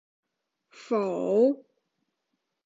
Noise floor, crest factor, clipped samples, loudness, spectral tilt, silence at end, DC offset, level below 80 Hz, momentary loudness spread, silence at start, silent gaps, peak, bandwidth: -81 dBFS; 18 dB; under 0.1%; -26 LUFS; -7.5 dB/octave; 1.1 s; under 0.1%; -84 dBFS; 8 LU; 0.8 s; none; -12 dBFS; 7.8 kHz